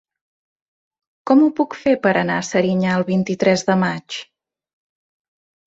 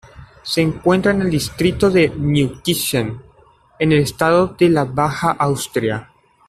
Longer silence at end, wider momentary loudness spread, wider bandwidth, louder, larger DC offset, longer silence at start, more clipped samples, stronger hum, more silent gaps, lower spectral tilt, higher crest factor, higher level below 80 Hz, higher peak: first, 1.45 s vs 0.45 s; first, 12 LU vs 7 LU; second, 8 kHz vs 15.5 kHz; about the same, -18 LUFS vs -17 LUFS; neither; first, 1.25 s vs 0.15 s; neither; neither; neither; about the same, -6 dB/octave vs -5.5 dB/octave; about the same, 18 dB vs 14 dB; second, -60 dBFS vs -44 dBFS; about the same, -2 dBFS vs -2 dBFS